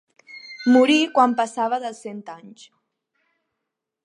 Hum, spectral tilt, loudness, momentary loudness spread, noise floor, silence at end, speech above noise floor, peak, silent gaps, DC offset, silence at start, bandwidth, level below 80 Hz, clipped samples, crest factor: none; -3.5 dB/octave; -19 LUFS; 24 LU; -82 dBFS; 1.55 s; 62 dB; -4 dBFS; none; under 0.1%; 0.35 s; 11 kHz; -80 dBFS; under 0.1%; 18 dB